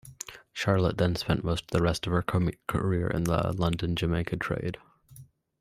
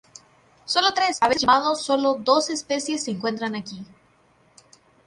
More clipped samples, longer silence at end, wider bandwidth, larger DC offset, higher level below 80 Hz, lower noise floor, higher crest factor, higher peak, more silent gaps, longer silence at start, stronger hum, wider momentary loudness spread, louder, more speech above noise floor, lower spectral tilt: neither; second, 0.4 s vs 1.2 s; first, 15 kHz vs 11.5 kHz; neither; first, -46 dBFS vs -62 dBFS; second, -53 dBFS vs -60 dBFS; about the same, 20 dB vs 20 dB; second, -8 dBFS vs -4 dBFS; neither; second, 0.05 s vs 0.65 s; neither; second, 8 LU vs 13 LU; second, -29 LUFS vs -22 LUFS; second, 25 dB vs 37 dB; first, -6 dB/octave vs -2.5 dB/octave